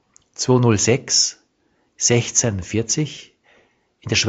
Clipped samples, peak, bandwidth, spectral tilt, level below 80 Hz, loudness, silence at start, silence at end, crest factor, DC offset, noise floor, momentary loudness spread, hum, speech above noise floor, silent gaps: under 0.1%; -2 dBFS; 8.2 kHz; -3.5 dB/octave; -52 dBFS; -18 LUFS; 0.4 s; 0 s; 20 dB; under 0.1%; -65 dBFS; 10 LU; none; 46 dB; none